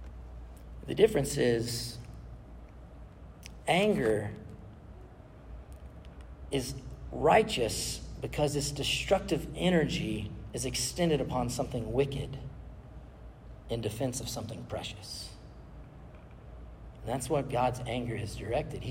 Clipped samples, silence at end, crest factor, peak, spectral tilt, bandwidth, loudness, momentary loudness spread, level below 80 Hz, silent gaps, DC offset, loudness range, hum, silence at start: under 0.1%; 0 s; 22 dB; -10 dBFS; -4.5 dB/octave; 16 kHz; -31 LUFS; 23 LU; -48 dBFS; none; under 0.1%; 9 LU; none; 0 s